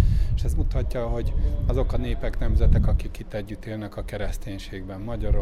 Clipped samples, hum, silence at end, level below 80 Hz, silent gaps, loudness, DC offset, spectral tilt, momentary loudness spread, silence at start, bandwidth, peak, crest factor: under 0.1%; none; 0 s; -24 dBFS; none; -28 LUFS; under 0.1%; -7.5 dB/octave; 12 LU; 0 s; 13 kHz; -6 dBFS; 16 dB